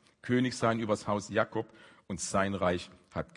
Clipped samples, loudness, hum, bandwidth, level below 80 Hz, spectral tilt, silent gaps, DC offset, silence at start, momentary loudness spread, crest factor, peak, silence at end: under 0.1%; -32 LUFS; none; 11 kHz; -64 dBFS; -5 dB/octave; none; under 0.1%; 0.25 s; 11 LU; 20 dB; -12 dBFS; 0.15 s